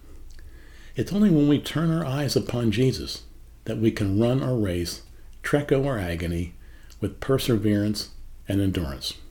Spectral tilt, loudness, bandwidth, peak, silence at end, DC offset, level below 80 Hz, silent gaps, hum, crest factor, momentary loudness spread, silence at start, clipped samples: -6.5 dB/octave; -25 LUFS; 19 kHz; -8 dBFS; 0 s; under 0.1%; -42 dBFS; none; none; 18 dB; 12 LU; 0.05 s; under 0.1%